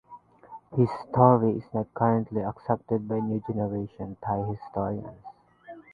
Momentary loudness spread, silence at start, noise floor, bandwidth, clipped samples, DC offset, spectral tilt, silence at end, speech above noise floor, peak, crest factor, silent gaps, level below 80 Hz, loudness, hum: 16 LU; 0.1 s; -50 dBFS; 4.9 kHz; under 0.1%; under 0.1%; -11.5 dB/octave; 0.1 s; 24 dB; -2 dBFS; 24 dB; none; -58 dBFS; -27 LUFS; none